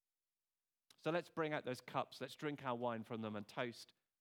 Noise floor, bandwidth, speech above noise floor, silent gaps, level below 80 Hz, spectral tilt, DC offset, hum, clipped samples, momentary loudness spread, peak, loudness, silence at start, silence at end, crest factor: under -90 dBFS; 19 kHz; over 46 dB; none; under -90 dBFS; -5.5 dB/octave; under 0.1%; none; under 0.1%; 5 LU; -24 dBFS; -44 LUFS; 1.05 s; 0.35 s; 22 dB